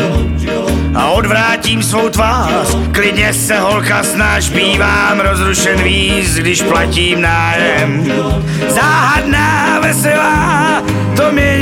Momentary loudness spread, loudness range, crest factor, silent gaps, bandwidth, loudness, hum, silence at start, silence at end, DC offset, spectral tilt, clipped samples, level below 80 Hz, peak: 4 LU; 1 LU; 10 dB; none; 17 kHz; -11 LUFS; none; 0 s; 0 s; under 0.1%; -4 dB/octave; under 0.1%; -24 dBFS; 0 dBFS